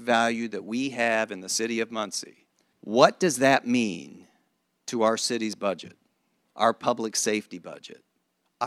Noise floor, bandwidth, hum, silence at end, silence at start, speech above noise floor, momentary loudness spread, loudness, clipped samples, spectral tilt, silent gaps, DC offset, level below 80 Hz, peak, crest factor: -74 dBFS; 14.5 kHz; none; 0 s; 0 s; 49 dB; 19 LU; -25 LUFS; under 0.1%; -3 dB/octave; none; under 0.1%; -74 dBFS; -2 dBFS; 24 dB